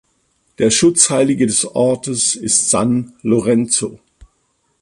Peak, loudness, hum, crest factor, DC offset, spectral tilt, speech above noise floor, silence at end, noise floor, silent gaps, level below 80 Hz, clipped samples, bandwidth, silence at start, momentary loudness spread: 0 dBFS; -14 LUFS; none; 16 dB; under 0.1%; -3.5 dB/octave; 49 dB; 0.85 s; -64 dBFS; none; -50 dBFS; under 0.1%; 11.5 kHz; 0.6 s; 7 LU